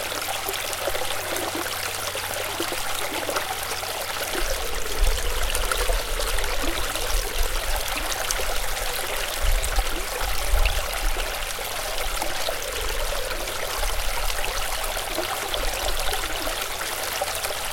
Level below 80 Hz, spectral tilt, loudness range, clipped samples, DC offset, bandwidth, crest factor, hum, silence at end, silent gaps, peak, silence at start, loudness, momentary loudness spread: -30 dBFS; -1.5 dB/octave; 1 LU; under 0.1%; under 0.1%; 17 kHz; 24 dB; none; 0 s; none; -2 dBFS; 0 s; -26 LUFS; 2 LU